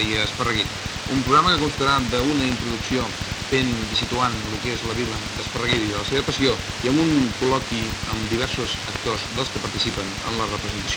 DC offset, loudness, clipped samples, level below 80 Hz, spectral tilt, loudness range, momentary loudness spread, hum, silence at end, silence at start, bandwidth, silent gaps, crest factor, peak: under 0.1%; -22 LUFS; under 0.1%; -38 dBFS; -4 dB/octave; 3 LU; 7 LU; none; 0 s; 0 s; over 20 kHz; none; 20 dB; -2 dBFS